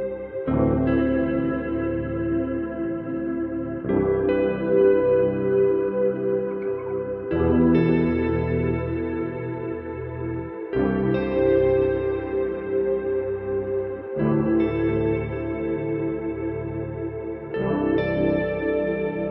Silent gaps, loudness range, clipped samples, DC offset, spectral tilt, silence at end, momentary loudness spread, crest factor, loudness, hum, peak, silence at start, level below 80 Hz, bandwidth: none; 4 LU; under 0.1%; under 0.1%; -11.5 dB/octave; 0 s; 10 LU; 16 dB; -24 LUFS; none; -8 dBFS; 0 s; -42 dBFS; 5.2 kHz